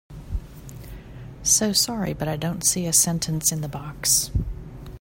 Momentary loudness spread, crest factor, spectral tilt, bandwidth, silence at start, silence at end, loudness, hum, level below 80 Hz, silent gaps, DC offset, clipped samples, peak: 23 LU; 20 dB; -3 dB/octave; 16.5 kHz; 0.1 s; 0 s; -21 LUFS; none; -38 dBFS; none; under 0.1%; under 0.1%; -4 dBFS